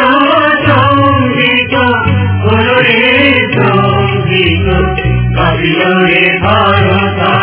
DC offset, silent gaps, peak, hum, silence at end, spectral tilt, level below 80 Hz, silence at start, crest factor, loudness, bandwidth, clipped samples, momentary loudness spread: under 0.1%; none; 0 dBFS; none; 0 s; -9.5 dB/octave; -24 dBFS; 0 s; 8 dB; -8 LUFS; 4 kHz; 0.8%; 5 LU